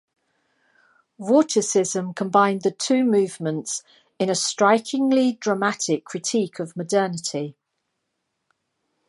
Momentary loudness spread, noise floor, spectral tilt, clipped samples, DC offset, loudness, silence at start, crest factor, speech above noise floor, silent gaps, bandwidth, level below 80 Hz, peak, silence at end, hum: 10 LU; -77 dBFS; -4 dB/octave; under 0.1%; under 0.1%; -22 LUFS; 1.2 s; 20 dB; 56 dB; none; 11.5 kHz; -76 dBFS; -4 dBFS; 1.6 s; none